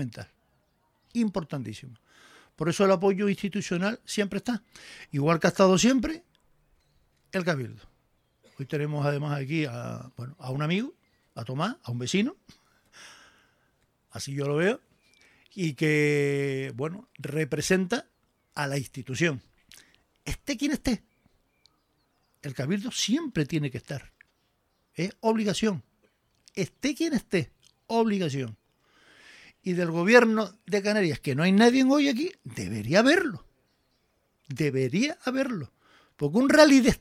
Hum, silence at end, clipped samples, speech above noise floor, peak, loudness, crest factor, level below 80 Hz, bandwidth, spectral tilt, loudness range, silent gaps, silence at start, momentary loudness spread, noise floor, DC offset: none; 0.05 s; under 0.1%; 46 dB; -4 dBFS; -26 LUFS; 24 dB; -54 dBFS; 15.5 kHz; -5.5 dB/octave; 9 LU; none; 0 s; 19 LU; -72 dBFS; under 0.1%